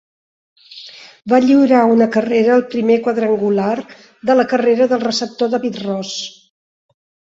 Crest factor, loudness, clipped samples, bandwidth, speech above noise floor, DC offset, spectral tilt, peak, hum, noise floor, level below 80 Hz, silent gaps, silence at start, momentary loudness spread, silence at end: 14 dB; -15 LUFS; under 0.1%; 7.8 kHz; 24 dB; under 0.1%; -5 dB/octave; -2 dBFS; none; -38 dBFS; -62 dBFS; none; 0.7 s; 16 LU; 1.1 s